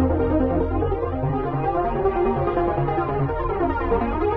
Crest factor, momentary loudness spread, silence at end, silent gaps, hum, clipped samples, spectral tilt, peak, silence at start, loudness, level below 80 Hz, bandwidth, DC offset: 14 dB; 3 LU; 0 s; none; none; under 0.1%; -11.5 dB/octave; -8 dBFS; 0 s; -23 LUFS; -32 dBFS; 4.9 kHz; 0.1%